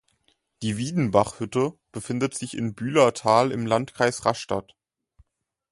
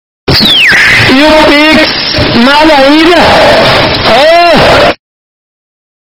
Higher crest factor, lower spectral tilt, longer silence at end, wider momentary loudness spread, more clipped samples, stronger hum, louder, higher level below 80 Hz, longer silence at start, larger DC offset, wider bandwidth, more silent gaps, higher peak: first, 22 dB vs 4 dB; about the same, -5.5 dB/octave vs -4.5 dB/octave; about the same, 1.1 s vs 1.1 s; first, 10 LU vs 5 LU; second, under 0.1% vs 9%; neither; second, -24 LUFS vs -3 LUFS; second, -58 dBFS vs -26 dBFS; first, 0.6 s vs 0.25 s; neither; second, 11.5 kHz vs over 20 kHz; neither; second, -4 dBFS vs 0 dBFS